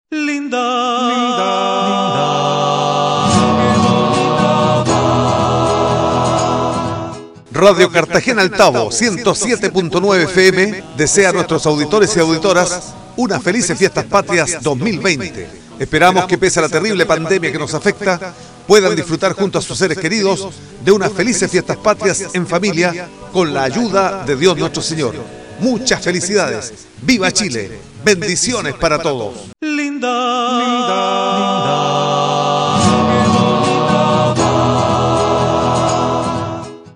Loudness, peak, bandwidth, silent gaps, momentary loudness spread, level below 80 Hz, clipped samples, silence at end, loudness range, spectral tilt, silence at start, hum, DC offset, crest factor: -14 LUFS; 0 dBFS; 14 kHz; none; 8 LU; -42 dBFS; 0.2%; 0.05 s; 3 LU; -4 dB/octave; 0.1 s; none; under 0.1%; 14 dB